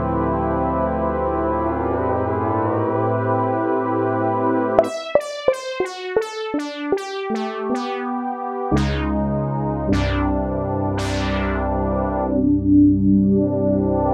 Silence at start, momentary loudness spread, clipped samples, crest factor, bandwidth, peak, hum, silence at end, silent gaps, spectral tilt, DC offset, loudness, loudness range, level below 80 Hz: 0 s; 8 LU; under 0.1%; 20 dB; 11 kHz; 0 dBFS; none; 0 s; none; -7.5 dB/octave; under 0.1%; -21 LUFS; 5 LU; -32 dBFS